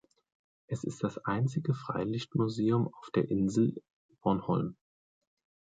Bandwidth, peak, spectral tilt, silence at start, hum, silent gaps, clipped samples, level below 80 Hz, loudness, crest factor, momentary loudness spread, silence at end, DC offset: 9.2 kHz; -14 dBFS; -7.5 dB/octave; 0.7 s; none; 3.90-4.09 s; under 0.1%; -64 dBFS; -32 LUFS; 18 dB; 9 LU; 1.05 s; under 0.1%